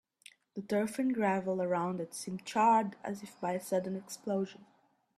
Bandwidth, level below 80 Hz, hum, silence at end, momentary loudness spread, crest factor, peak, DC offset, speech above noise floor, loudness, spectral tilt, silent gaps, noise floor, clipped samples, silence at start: 14 kHz; -78 dBFS; none; 0.65 s; 14 LU; 18 dB; -16 dBFS; under 0.1%; 28 dB; -33 LUFS; -5.5 dB/octave; none; -61 dBFS; under 0.1%; 0.55 s